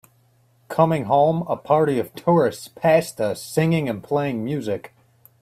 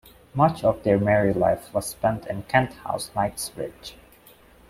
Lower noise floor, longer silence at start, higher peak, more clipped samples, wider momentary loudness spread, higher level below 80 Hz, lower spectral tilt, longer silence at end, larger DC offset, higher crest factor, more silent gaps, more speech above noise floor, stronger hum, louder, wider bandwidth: first, -59 dBFS vs -52 dBFS; first, 0.7 s vs 0.35 s; about the same, -2 dBFS vs -4 dBFS; neither; second, 8 LU vs 15 LU; second, -60 dBFS vs -50 dBFS; about the same, -6.5 dB/octave vs -5.5 dB/octave; second, 0.55 s vs 0.75 s; neither; about the same, 18 dB vs 20 dB; neither; first, 39 dB vs 29 dB; neither; first, -21 LUFS vs -24 LUFS; about the same, 15.5 kHz vs 16 kHz